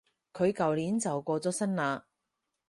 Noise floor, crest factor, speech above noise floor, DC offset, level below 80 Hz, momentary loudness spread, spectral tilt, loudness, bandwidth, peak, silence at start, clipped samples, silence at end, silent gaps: -84 dBFS; 18 dB; 54 dB; under 0.1%; -70 dBFS; 6 LU; -5.5 dB/octave; -31 LUFS; 11.5 kHz; -14 dBFS; 0.35 s; under 0.1%; 0.7 s; none